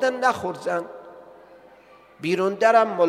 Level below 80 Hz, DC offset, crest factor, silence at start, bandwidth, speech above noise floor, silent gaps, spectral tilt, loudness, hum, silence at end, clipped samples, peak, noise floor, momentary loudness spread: -68 dBFS; under 0.1%; 20 dB; 0 s; 14 kHz; 30 dB; none; -5 dB/octave; -22 LUFS; none; 0 s; under 0.1%; -4 dBFS; -51 dBFS; 16 LU